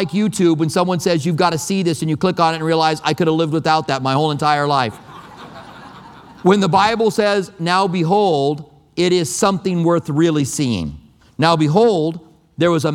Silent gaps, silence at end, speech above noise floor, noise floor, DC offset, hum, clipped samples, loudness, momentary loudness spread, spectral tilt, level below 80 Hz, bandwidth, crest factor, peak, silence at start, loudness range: none; 0 s; 23 dB; -39 dBFS; under 0.1%; none; under 0.1%; -17 LUFS; 10 LU; -5.5 dB/octave; -52 dBFS; 16 kHz; 16 dB; 0 dBFS; 0 s; 2 LU